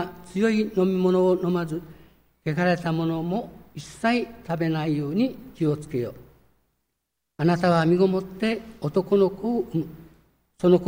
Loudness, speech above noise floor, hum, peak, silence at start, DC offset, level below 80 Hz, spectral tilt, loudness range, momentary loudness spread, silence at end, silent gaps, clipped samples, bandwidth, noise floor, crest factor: -24 LUFS; 57 dB; none; -6 dBFS; 0 s; under 0.1%; -56 dBFS; -7.5 dB/octave; 4 LU; 11 LU; 0 s; none; under 0.1%; 16 kHz; -80 dBFS; 18 dB